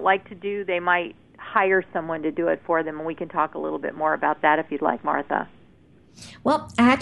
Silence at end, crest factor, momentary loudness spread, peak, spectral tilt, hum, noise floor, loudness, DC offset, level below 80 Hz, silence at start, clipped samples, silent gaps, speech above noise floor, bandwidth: 0 s; 20 dB; 10 LU; -4 dBFS; -5.5 dB/octave; none; -54 dBFS; -24 LUFS; 0.2%; -60 dBFS; 0 s; under 0.1%; none; 31 dB; 11 kHz